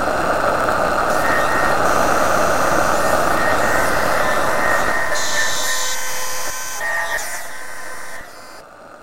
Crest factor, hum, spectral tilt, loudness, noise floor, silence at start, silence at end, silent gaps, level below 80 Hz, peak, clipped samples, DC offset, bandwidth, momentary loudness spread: 16 dB; none; -2.5 dB/octave; -18 LUFS; -39 dBFS; 0 s; 0 s; none; -40 dBFS; -2 dBFS; under 0.1%; 9%; 16 kHz; 15 LU